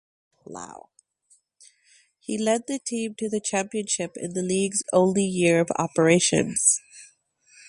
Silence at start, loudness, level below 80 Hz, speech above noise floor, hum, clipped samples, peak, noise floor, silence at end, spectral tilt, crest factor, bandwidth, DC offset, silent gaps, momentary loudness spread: 0.5 s; -23 LUFS; -64 dBFS; 40 dB; none; under 0.1%; -4 dBFS; -64 dBFS; 0.65 s; -4 dB/octave; 22 dB; 11.5 kHz; under 0.1%; none; 18 LU